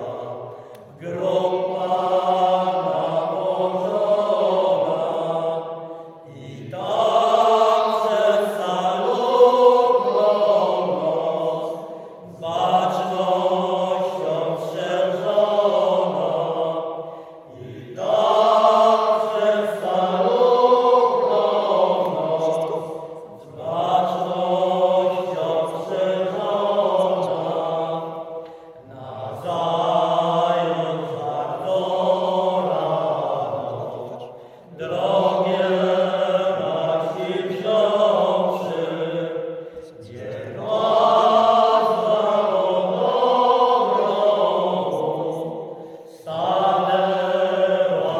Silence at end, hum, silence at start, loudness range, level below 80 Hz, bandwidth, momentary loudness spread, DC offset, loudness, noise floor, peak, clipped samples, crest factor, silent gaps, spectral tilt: 0 s; none; 0 s; 5 LU; -72 dBFS; 13.5 kHz; 17 LU; under 0.1%; -20 LUFS; -41 dBFS; -2 dBFS; under 0.1%; 18 dB; none; -6 dB/octave